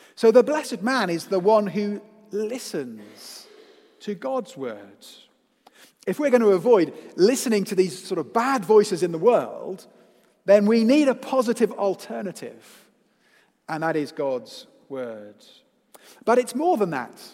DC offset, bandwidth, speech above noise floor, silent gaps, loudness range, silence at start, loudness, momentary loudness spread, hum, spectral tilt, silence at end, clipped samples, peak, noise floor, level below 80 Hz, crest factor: under 0.1%; 16 kHz; 40 dB; none; 11 LU; 0.2 s; -22 LUFS; 19 LU; none; -5 dB/octave; 0.05 s; under 0.1%; -4 dBFS; -62 dBFS; -82 dBFS; 20 dB